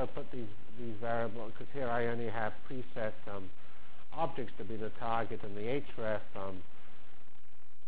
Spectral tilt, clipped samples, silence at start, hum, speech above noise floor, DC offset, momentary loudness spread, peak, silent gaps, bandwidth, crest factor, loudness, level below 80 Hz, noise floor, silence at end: -9 dB/octave; under 0.1%; 0 s; none; 27 dB; 4%; 16 LU; -18 dBFS; none; 4 kHz; 20 dB; -40 LUFS; -62 dBFS; -66 dBFS; 0 s